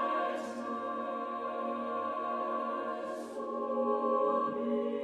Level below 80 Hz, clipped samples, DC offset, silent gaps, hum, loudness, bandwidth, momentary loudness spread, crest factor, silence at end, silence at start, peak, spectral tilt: -80 dBFS; under 0.1%; under 0.1%; none; none; -34 LUFS; 11.5 kHz; 8 LU; 14 dB; 0 s; 0 s; -20 dBFS; -5.5 dB/octave